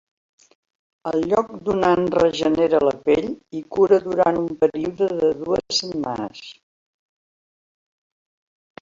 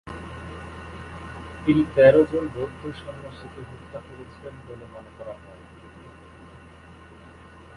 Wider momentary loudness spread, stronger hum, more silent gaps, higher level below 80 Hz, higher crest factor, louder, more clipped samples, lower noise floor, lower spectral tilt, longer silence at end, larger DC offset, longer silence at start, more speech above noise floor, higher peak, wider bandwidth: second, 12 LU vs 30 LU; neither; neither; second, -54 dBFS vs -48 dBFS; about the same, 18 dB vs 22 dB; about the same, -20 LUFS vs -20 LUFS; neither; first, under -90 dBFS vs -47 dBFS; second, -5 dB/octave vs -8 dB/octave; second, 2.3 s vs 2.45 s; neither; first, 1.05 s vs 0.05 s; first, over 70 dB vs 23 dB; about the same, -4 dBFS vs -4 dBFS; second, 7.6 kHz vs 11 kHz